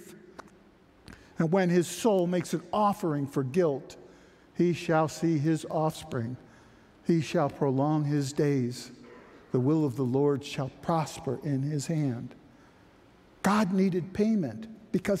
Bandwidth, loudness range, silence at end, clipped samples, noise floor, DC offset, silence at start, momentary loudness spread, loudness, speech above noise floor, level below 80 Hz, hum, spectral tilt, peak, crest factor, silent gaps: 15.5 kHz; 3 LU; 0 s; under 0.1%; -58 dBFS; under 0.1%; 0 s; 11 LU; -29 LUFS; 31 dB; -64 dBFS; none; -6.5 dB/octave; -12 dBFS; 16 dB; none